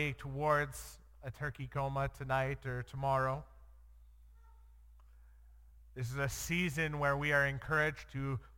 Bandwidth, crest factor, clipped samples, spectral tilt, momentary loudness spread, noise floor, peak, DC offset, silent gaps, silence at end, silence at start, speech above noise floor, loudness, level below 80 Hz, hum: 17 kHz; 20 dB; under 0.1%; -5.5 dB/octave; 12 LU; -59 dBFS; -18 dBFS; under 0.1%; none; 0 s; 0 s; 23 dB; -36 LUFS; -54 dBFS; none